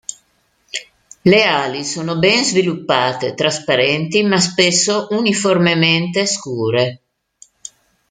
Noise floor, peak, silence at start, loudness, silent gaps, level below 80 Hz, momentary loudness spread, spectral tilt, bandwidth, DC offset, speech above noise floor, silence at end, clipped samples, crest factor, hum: -60 dBFS; 0 dBFS; 0.1 s; -15 LUFS; none; -58 dBFS; 15 LU; -3.5 dB/octave; 9.6 kHz; under 0.1%; 45 dB; 1.15 s; under 0.1%; 16 dB; none